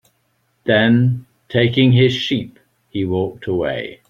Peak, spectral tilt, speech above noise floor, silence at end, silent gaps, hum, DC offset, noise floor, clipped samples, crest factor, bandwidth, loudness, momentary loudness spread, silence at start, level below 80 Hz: -2 dBFS; -7.5 dB/octave; 49 dB; 0.15 s; none; none; under 0.1%; -65 dBFS; under 0.1%; 16 dB; 7.2 kHz; -17 LUFS; 14 LU; 0.65 s; -52 dBFS